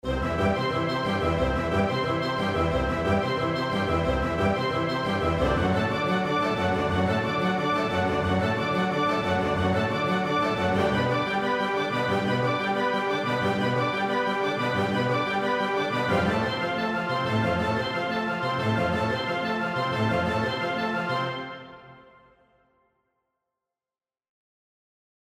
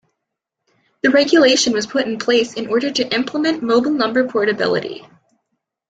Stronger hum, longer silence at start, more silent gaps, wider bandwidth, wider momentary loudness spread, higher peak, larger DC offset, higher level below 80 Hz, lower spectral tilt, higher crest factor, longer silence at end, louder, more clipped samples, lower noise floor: neither; second, 0.05 s vs 1.05 s; neither; first, 15 kHz vs 9.4 kHz; second, 3 LU vs 8 LU; second, -12 dBFS vs -2 dBFS; neither; first, -44 dBFS vs -62 dBFS; first, -6.5 dB/octave vs -3 dB/octave; about the same, 14 dB vs 16 dB; first, 3.4 s vs 0.9 s; second, -25 LUFS vs -16 LUFS; neither; first, under -90 dBFS vs -79 dBFS